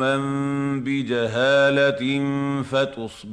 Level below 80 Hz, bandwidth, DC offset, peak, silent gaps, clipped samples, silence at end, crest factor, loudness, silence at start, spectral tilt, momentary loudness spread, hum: -58 dBFS; 10.5 kHz; under 0.1%; -8 dBFS; none; under 0.1%; 0 s; 14 dB; -21 LUFS; 0 s; -6 dB/octave; 7 LU; none